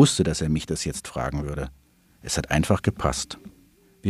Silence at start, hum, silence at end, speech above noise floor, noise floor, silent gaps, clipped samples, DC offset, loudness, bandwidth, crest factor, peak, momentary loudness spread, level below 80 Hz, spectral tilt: 0 s; none; 0 s; 33 dB; -57 dBFS; none; under 0.1%; under 0.1%; -26 LUFS; 14.5 kHz; 22 dB; -4 dBFS; 12 LU; -40 dBFS; -5 dB/octave